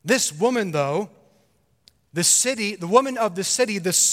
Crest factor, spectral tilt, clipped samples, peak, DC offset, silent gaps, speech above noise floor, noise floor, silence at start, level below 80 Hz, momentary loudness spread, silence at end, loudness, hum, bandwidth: 20 dB; -2.5 dB/octave; under 0.1%; -2 dBFS; under 0.1%; none; 43 dB; -64 dBFS; 0.05 s; -70 dBFS; 9 LU; 0 s; -20 LUFS; none; 16.5 kHz